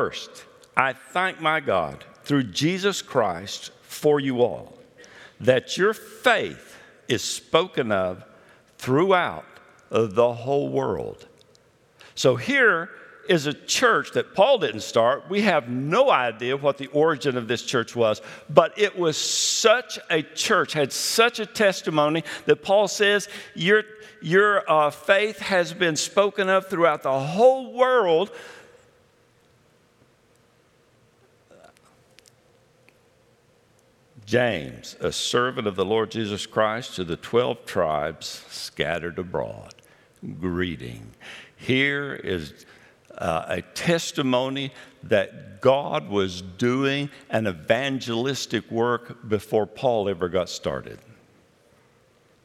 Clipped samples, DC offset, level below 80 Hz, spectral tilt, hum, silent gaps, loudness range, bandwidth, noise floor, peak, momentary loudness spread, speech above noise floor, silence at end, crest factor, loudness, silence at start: under 0.1%; under 0.1%; -62 dBFS; -4 dB/octave; none; none; 7 LU; 16 kHz; -60 dBFS; 0 dBFS; 14 LU; 37 dB; 1.5 s; 24 dB; -23 LUFS; 0 s